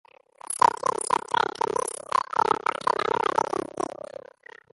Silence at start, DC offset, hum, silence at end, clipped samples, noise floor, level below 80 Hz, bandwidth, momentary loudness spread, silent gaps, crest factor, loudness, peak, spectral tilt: 0.5 s; under 0.1%; none; 0.85 s; under 0.1%; -49 dBFS; -64 dBFS; 12 kHz; 11 LU; none; 22 dB; -26 LUFS; -6 dBFS; -2.5 dB/octave